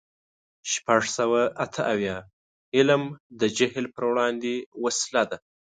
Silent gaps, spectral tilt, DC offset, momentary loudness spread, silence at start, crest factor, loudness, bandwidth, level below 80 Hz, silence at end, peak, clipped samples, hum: 2.33-2.72 s, 3.20-3.30 s, 4.66-4.72 s; -3.5 dB/octave; under 0.1%; 9 LU; 0.65 s; 22 dB; -25 LUFS; 9.6 kHz; -64 dBFS; 0.4 s; -4 dBFS; under 0.1%; none